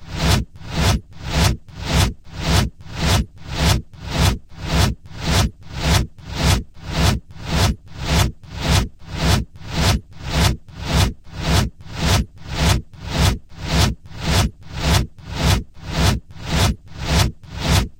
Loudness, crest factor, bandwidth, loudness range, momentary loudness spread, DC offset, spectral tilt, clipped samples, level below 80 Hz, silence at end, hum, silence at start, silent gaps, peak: -21 LUFS; 16 dB; 16 kHz; 1 LU; 8 LU; under 0.1%; -4.5 dB/octave; under 0.1%; -26 dBFS; 0.05 s; none; 0 s; none; -4 dBFS